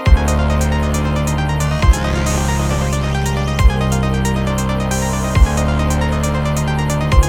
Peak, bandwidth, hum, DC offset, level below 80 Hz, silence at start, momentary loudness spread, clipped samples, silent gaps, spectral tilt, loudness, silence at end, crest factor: 0 dBFS; 16.5 kHz; none; under 0.1%; -18 dBFS; 0 s; 3 LU; under 0.1%; none; -5.5 dB/octave; -17 LUFS; 0 s; 14 dB